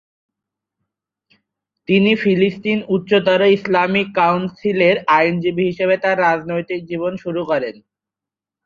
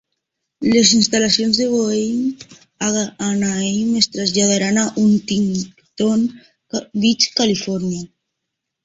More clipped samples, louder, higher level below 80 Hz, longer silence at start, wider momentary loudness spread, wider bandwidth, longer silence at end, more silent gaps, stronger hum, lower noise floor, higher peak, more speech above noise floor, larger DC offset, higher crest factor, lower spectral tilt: neither; about the same, -17 LUFS vs -17 LUFS; second, -60 dBFS vs -54 dBFS; first, 1.9 s vs 0.6 s; about the same, 9 LU vs 11 LU; second, 7 kHz vs 8 kHz; first, 0.95 s vs 0.8 s; neither; neither; first, -88 dBFS vs -79 dBFS; about the same, 0 dBFS vs 0 dBFS; first, 71 dB vs 62 dB; neither; about the same, 18 dB vs 18 dB; first, -7.5 dB/octave vs -3.5 dB/octave